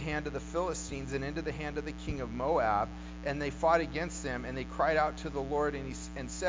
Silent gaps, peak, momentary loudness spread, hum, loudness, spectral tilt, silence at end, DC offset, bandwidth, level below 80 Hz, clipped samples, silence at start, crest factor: none; -14 dBFS; 10 LU; none; -34 LUFS; -5 dB/octave; 0 s; under 0.1%; 7.8 kHz; -46 dBFS; under 0.1%; 0 s; 20 dB